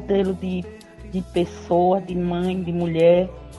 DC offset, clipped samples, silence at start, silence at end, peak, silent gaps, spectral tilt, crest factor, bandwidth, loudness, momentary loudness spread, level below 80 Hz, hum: under 0.1%; under 0.1%; 0 s; 0 s; -4 dBFS; none; -8 dB/octave; 16 dB; 11.5 kHz; -22 LUFS; 14 LU; -44 dBFS; none